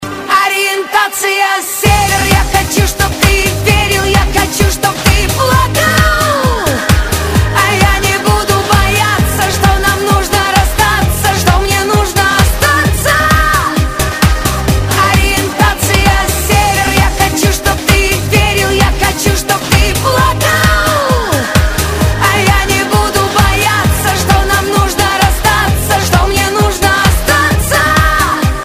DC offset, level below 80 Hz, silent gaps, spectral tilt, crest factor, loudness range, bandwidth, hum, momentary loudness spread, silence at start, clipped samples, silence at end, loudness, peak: 0.4%; -18 dBFS; none; -4 dB/octave; 10 dB; 1 LU; 16 kHz; none; 3 LU; 0 s; under 0.1%; 0 s; -10 LUFS; 0 dBFS